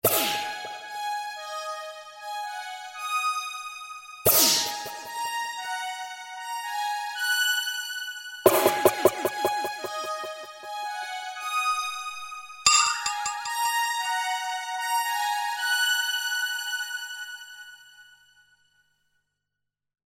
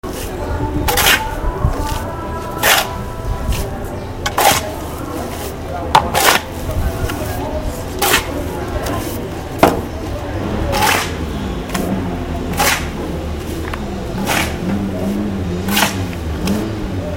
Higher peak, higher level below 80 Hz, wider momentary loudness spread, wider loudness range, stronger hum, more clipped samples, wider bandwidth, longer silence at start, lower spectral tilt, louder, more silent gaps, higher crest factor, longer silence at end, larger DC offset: second, -4 dBFS vs 0 dBFS; second, -66 dBFS vs -26 dBFS; first, 16 LU vs 12 LU; first, 7 LU vs 3 LU; first, 50 Hz at -75 dBFS vs none; neither; about the same, 16.5 kHz vs 17 kHz; about the same, 0.05 s vs 0.05 s; second, -0.5 dB/octave vs -3.5 dB/octave; second, -26 LUFS vs -18 LUFS; neither; first, 26 dB vs 18 dB; first, 2.1 s vs 0 s; neither